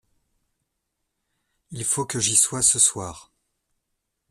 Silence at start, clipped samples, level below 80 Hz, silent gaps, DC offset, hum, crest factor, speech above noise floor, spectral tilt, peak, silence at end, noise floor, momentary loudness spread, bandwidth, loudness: 1.7 s; under 0.1%; -58 dBFS; none; under 0.1%; none; 22 dB; 56 dB; -1.5 dB/octave; -4 dBFS; 1.1 s; -79 dBFS; 19 LU; 15 kHz; -19 LUFS